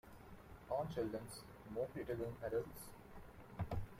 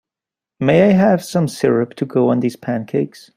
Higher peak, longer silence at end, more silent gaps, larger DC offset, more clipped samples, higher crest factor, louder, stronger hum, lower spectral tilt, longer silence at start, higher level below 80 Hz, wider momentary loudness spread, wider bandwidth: second, -30 dBFS vs -2 dBFS; second, 0 s vs 0.3 s; neither; neither; neither; about the same, 16 dB vs 16 dB; second, -46 LUFS vs -16 LUFS; neither; about the same, -6.5 dB/octave vs -7 dB/octave; second, 0.05 s vs 0.6 s; about the same, -60 dBFS vs -56 dBFS; first, 16 LU vs 9 LU; about the same, 16 kHz vs 15.5 kHz